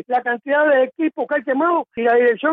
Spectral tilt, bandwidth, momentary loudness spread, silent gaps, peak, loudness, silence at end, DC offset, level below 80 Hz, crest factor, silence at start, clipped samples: -7.5 dB/octave; 4 kHz; 5 LU; none; -6 dBFS; -18 LUFS; 0 s; under 0.1%; -70 dBFS; 10 dB; 0.1 s; under 0.1%